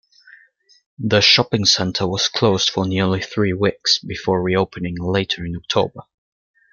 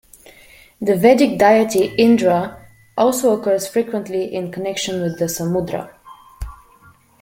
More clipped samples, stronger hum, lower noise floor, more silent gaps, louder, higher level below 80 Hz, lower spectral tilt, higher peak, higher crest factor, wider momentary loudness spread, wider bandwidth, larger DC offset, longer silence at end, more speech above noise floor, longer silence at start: neither; neither; first, -54 dBFS vs -50 dBFS; neither; about the same, -18 LUFS vs -17 LUFS; about the same, -50 dBFS vs -46 dBFS; about the same, -4 dB/octave vs -5 dB/octave; about the same, 0 dBFS vs -2 dBFS; about the same, 20 dB vs 16 dB; second, 10 LU vs 16 LU; second, 7.4 kHz vs 16.5 kHz; neither; about the same, 0.7 s vs 0.65 s; about the same, 36 dB vs 33 dB; first, 1 s vs 0.8 s